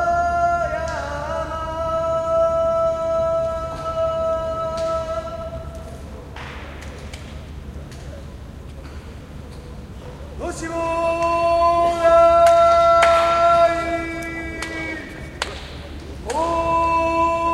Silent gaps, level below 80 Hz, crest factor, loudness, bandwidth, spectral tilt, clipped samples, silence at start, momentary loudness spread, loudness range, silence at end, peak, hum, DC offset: none; -36 dBFS; 18 dB; -19 LUFS; 12.5 kHz; -5 dB/octave; under 0.1%; 0 s; 23 LU; 20 LU; 0 s; -2 dBFS; none; under 0.1%